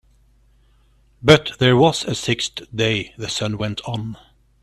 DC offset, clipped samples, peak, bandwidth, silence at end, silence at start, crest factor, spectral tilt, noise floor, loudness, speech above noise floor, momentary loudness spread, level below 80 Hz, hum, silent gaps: under 0.1%; under 0.1%; 0 dBFS; 13.5 kHz; 0.45 s; 1.2 s; 20 dB; -5 dB/octave; -56 dBFS; -19 LUFS; 37 dB; 12 LU; -48 dBFS; none; none